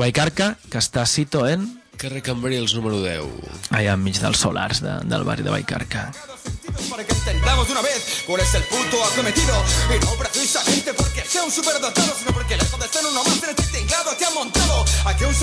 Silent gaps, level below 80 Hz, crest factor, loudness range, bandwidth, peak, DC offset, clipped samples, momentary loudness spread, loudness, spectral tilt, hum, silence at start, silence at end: none; -28 dBFS; 16 dB; 4 LU; 11 kHz; -4 dBFS; under 0.1%; under 0.1%; 9 LU; -20 LUFS; -3.5 dB/octave; none; 0 s; 0 s